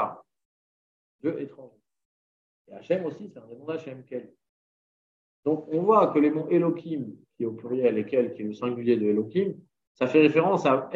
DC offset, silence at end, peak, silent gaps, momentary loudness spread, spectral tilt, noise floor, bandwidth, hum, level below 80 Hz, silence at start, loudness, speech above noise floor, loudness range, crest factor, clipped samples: under 0.1%; 0 s; -6 dBFS; 0.45-1.19 s, 2.05-2.65 s, 4.49-5.43 s, 9.87-9.95 s; 18 LU; -8 dB/octave; under -90 dBFS; 7.4 kHz; none; -76 dBFS; 0 s; -26 LUFS; over 65 dB; 11 LU; 20 dB; under 0.1%